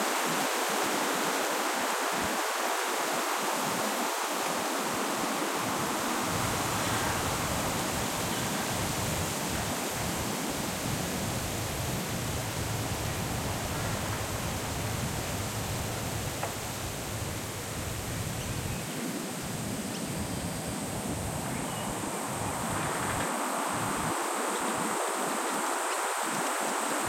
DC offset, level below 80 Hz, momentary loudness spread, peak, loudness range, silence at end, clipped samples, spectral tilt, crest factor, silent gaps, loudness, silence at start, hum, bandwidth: under 0.1%; -50 dBFS; 5 LU; -16 dBFS; 5 LU; 0 s; under 0.1%; -3.5 dB/octave; 16 dB; none; -31 LUFS; 0 s; none; 16.5 kHz